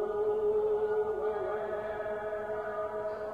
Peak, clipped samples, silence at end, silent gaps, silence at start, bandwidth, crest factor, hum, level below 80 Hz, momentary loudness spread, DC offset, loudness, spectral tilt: -22 dBFS; under 0.1%; 0 s; none; 0 s; 4.9 kHz; 10 dB; none; -62 dBFS; 7 LU; under 0.1%; -33 LUFS; -7 dB/octave